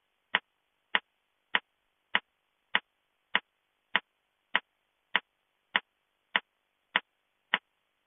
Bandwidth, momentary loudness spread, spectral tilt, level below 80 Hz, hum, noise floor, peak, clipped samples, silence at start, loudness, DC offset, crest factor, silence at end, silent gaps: 3.9 kHz; 0 LU; 4 dB/octave; under -90 dBFS; none; -79 dBFS; -6 dBFS; under 0.1%; 0.35 s; -33 LUFS; under 0.1%; 30 dB; 0.5 s; none